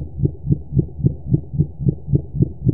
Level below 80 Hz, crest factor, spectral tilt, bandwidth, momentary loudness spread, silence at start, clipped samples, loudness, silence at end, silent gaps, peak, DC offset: -32 dBFS; 18 dB; -18.5 dB/octave; 0.9 kHz; 4 LU; 0 s; under 0.1%; -21 LUFS; 0 s; none; -2 dBFS; 2%